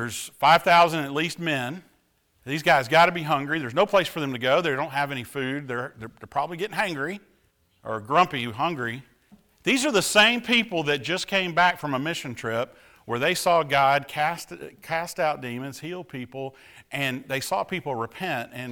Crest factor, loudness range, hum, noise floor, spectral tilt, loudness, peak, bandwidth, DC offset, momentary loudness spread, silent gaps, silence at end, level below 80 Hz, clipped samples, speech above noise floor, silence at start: 18 dB; 8 LU; none; -66 dBFS; -3.5 dB/octave; -24 LUFS; -6 dBFS; over 20 kHz; under 0.1%; 16 LU; none; 0 s; -62 dBFS; under 0.1%; 42 dB; 0 s